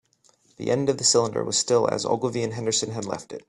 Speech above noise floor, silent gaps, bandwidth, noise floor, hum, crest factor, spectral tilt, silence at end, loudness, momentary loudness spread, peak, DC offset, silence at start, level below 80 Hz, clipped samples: 38 dB; none; 11.5 kHz; -62 dBFS; none; 20 dB; -3.5 dB/octave; 0.1 s; -23 LUFS; 11 LU; -6 dBFS; under 0.1%; 0.6 s; -64 dBFS; under 0.1%